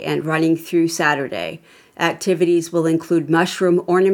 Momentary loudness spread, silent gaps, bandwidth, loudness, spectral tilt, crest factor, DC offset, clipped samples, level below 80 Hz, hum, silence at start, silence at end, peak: 5 LU; none; 18 kHz; -18 LUFS; -5.5 dB/octave; 18 dB; under 0.1%; under 0.1%; -68 dBFS; none; 0 s; 0 s; 0 dBFS